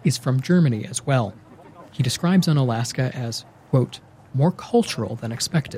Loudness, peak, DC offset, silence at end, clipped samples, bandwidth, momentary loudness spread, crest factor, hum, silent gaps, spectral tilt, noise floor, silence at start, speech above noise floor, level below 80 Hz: -22 LUFS; -8 dBFS; under 0.1%; 0 s; under 0.1%; 15.5 kHz; 11 LU; 14 dB; none; none; -6 dB/octave; -45 dBFS; 0.05 s; 24 dB; -58 dBFS